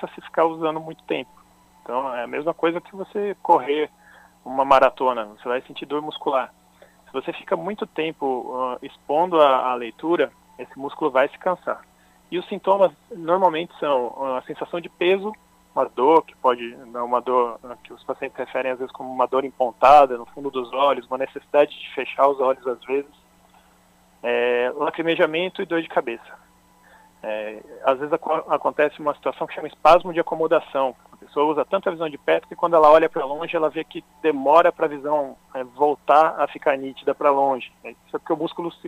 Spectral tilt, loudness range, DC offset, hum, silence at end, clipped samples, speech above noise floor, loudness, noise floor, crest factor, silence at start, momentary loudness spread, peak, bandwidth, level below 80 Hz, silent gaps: -6 dB/octave; 6 LU; under 0.1%; none; 0 s; under 0.1%; 35 dB; -22 LUFS; -56 dBFS; 20 dB; 0 s; 14 LU; -2 dBFS; 15 kHz; -58 dBFS; none